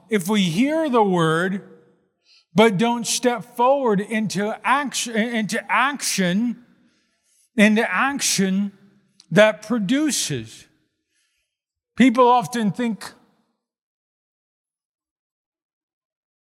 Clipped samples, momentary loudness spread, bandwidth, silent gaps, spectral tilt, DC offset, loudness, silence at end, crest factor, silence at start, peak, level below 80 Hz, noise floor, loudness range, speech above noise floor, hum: under 0.1%; 10 LU; 16.5 kHz; none; -4 dB/octave; under 0.1%; -20 LUFS; 3.35 s; 22 dB; 0.1 s; 0 dBFS; -68 dBFS; -83 dBFS; 3 LU; 64 dB; none